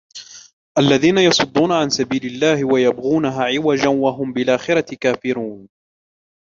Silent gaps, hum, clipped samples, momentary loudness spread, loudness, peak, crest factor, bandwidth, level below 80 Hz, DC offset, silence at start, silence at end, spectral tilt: 0.53-0.75 s; none; under 0.1%; 9 LU; -17 LUFS; -2 dBFS; 16 dB; 7.6 kHz; -56 dBFS; under 0.1%; 0.15 s; 0.8 s; -4.5 dB/octave